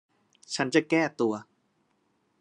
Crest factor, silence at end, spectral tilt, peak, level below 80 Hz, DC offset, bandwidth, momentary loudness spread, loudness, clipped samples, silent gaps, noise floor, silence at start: 22 dB; 1 s; -4.5 dB/octave; -8 dBFS; -82 dBFS; under 0.1%; 10.5 kHz; 12 LU; -27 LUFS; under 0.1%; none; -72 dBFS; 0.5 s